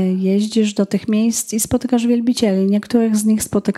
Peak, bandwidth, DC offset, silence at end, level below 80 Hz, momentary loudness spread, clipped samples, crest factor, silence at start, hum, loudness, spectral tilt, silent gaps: -2 dBFS; 15 kHz; under 0.1%; 0.05 s; -48 dBFS; 3 LU; under 0.1%; 14 dB; 0 s; none; -17 LUFS; -5.5 dB/octave; none